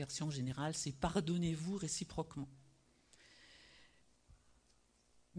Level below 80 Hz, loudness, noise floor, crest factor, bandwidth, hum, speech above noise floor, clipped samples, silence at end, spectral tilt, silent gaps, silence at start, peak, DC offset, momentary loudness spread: -62 dBFS; -41 LUFS; -73 dBFS; 22 dB; 10.5 kHz; none; 33 dB; under 0.1%; 0 s; -5 dB/octave; none; 0 s; -22 dBFS; under 0.1%; 23 LU